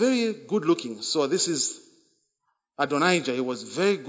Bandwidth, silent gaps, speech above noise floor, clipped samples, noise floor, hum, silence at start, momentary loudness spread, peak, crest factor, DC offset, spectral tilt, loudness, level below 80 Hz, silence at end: 8 kHz; none; 52 dB; under 0.1%; -77 dBFS; none; 0 s; 7 LU; -8 dBFS; 18 dB; under 0.1%; -3.5 dB/octave; -25 LUFS; -78 dBFS; 0 s